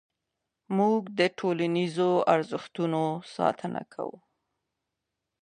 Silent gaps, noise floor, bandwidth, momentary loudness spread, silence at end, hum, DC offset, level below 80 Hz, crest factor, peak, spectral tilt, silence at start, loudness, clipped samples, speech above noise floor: none; -85 dBFS; 10 kHz; 11 LU; 1.3 s; none; under 0.1%; -78 dBFS; 20 dB; -8 dBFS; -6.5 dB/octave; 0.7 s; -28 LUFS; under 0.1%; 58 dB